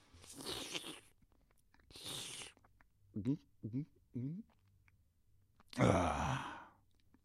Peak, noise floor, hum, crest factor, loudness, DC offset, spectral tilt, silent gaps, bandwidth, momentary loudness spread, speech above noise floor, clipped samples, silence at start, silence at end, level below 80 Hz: -16 dBFS; -72 dBFS; none; 28 dB; -41 LUFS; under 0.1%; -5 dB/octave; none; 15.5 kHz; 19 LU; 34 dB; under 0.1%; 0.15 s; 0.55 s; -60 dBFS